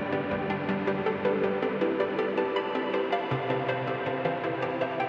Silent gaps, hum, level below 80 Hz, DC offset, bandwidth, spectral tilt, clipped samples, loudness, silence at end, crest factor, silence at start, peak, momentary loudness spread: none; none; -62 dBFS; under 0.1%; 7 kHz; -8 dB/octave; under 0.1%; -29 LUFS; 0 s; 14 dB; 0 s; -14 dBFS; 2 LU